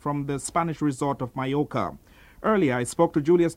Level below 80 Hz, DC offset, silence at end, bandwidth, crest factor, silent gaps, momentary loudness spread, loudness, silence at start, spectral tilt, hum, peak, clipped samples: -54 dBFS; under 0.1%; 0 s; 14.5 kHz; 18 dB; none; 8 LU; -25 LUFS; 0.05 s; -6 dB/octave; none; -6 dBFS; under 0.1%